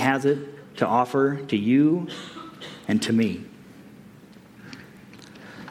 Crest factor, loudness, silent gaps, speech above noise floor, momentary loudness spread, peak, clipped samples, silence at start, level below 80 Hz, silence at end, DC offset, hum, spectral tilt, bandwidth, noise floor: 20 dB; -23 LUFS; none; 26 dB; 23 LU; -6 dBFS; under 0.1%; 0 s; -66 dBFS; 0 s; under 0.1%; none; -6 dB/octave; 15.5 kHz; -48 dBFS